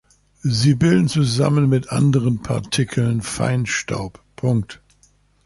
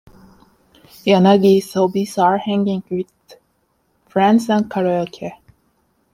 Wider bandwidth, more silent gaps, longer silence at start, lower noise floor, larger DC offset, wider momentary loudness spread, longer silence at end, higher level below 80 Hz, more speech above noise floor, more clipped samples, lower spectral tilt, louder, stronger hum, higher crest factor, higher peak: second, 11.5 kHz vs 15.5 kHz; neither; second, 0.45 s vs 1.05 s; second, -57 dBFS vs -64 dBFS; neither; second, 10 LU vs 14 LU; about the same, 0.7 s vs 0.8 s; first, -46 dBFS vs -60 dBFS; second, 39 dB vs 48 dB; neither; about the same, -6 dB/octave vs -6.5 dB/octave; about the same, -19 LUFS vs -17 LUFS; neither; about the same, 14 dB vs 16 dB; about the same, -4 dBFS vs -2 dBFS